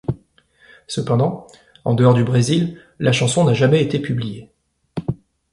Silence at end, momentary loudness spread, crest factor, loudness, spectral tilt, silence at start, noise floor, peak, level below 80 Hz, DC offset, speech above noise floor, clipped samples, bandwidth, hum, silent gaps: 0.35 s; 17 LU; 18 dB; -18 LUFS; -6 dB/octave; 0.1 s; -55 dBFS; -2 dBFS; -50 dBFS; under 0.1%; 38 dB; under 0.1%; 11.5 kHz; none; none